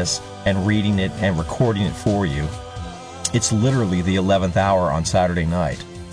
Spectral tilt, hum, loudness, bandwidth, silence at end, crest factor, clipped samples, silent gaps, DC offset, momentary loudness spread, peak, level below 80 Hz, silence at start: -5 dB/octave; none; -20 LUFS; 11 kHz; 0 s; 14 dB; under 0.1%; none; under 0.1%; 9 LU; -6 dBFS; -38 dBFS; 0 s